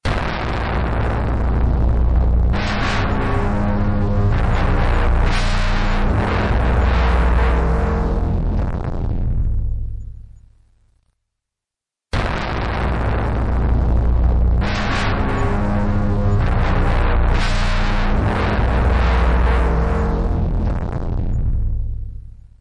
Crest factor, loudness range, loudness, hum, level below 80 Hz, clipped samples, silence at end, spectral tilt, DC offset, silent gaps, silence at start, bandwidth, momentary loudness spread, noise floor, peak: 10 dB; 7 LU; -19 LUFS; none; -18 dBFS; under 0.1%; 0.1 s; -7 dB/octave; under 0.1%; none; 0.05 s; 8.6 kHz; 7 LU; -87 dBFS; -6 dBFS